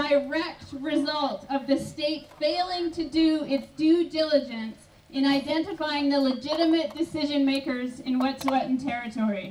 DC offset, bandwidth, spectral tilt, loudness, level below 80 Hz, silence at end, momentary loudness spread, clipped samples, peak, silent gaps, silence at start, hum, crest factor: under 0.1%; 13.5 kHz; -5 dB/octave; -26 LUFS; -60 dBFS; 0 s; 7 LU; under 0.1%; -10 dBFS; none; 0 s; none; 16 dB